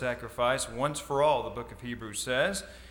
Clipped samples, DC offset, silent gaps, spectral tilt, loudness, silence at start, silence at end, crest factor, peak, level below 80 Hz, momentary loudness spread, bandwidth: under 0.1%; under 0.1%; none; -3.5 dB/octave; -30 LUFS; 0 s; 0 s; 18 dB; -14 dBFS; -52 dBFS; 12 LU; 19.5 kHz